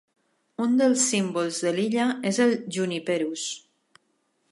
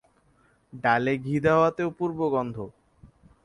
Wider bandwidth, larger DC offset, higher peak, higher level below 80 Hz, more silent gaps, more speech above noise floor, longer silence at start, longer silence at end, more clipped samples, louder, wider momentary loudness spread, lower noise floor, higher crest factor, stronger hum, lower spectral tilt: about the same, 11.5 kHz vs 11 kHz; neither; about the same, -10 dBFS vs -8 dBFS; second, -78 dBFS vs -58 dBFS; neither; first, 47 dB vs 39 dB; second, 0.6 s vs 0.75 s; first, 0.95 s vs 0.4 s; neither; about the same, -25 LUFS vs -25 LUFS; second, 10 LU vs 13 LU; first, -71 dBFS vs -64 dBFS; about the same, 16 dB vs 18 dB; neither; second, -3.5 dB/octave vs -7.5 dB/octave